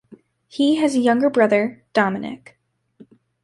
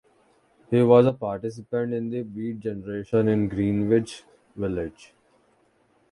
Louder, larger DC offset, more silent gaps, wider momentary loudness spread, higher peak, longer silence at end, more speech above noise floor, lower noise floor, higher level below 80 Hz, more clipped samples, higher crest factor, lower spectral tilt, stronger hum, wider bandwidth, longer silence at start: first, -19 LUFS vs -24 LUFS; neither; neither; about the same, 16 LU vs 15 LU; about the same, -4 dBFS vs -4 dBFS; about the same, 1.1 s vs 1.2 s; second, 32 dB vs 40 dB; second, -51 dBFS vs -64 dBFS; second, -66 dBFS vs -54 dBFS; neither; about the same, 18 dB vs 22 dB; second, -5.5 dB/octave vs -8.5 dB/octave; neither; about the same, 11.5 kHz vs 11 kHz; second, 0.1 s vs 0.7 s